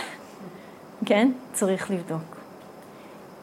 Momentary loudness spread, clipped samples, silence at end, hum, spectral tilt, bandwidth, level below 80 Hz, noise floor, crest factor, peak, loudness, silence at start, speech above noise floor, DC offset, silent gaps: 23 LU; under 0.1%; 0 s; none; -5 dB/octave; 16 kHz; -72 dBFS; -45 dBFS; 22 dB; -8 dBFS; -26 LUFS; 0 s; 21 dB; under 0.1%; none